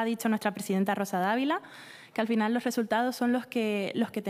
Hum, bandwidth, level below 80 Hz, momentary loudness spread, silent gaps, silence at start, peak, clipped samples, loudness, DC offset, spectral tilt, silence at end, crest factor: none; 16 kHz; -80 dBFS; 6 LU; none; 0 s; -12 dBFS; under 0.1%; -29 LUFS; under 0.1%; -5 dB/octave; 0 s; 16 dB